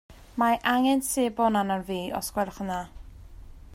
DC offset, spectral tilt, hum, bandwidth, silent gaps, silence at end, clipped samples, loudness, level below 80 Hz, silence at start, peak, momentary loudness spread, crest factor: under 0.1%; -4 dB/octave; none; 16 kHz; none; 0 s; under 0.1%; -26 LUFS; -50 dBFS; 0.1 s; -8 dBFS; 10 LU; 18 dB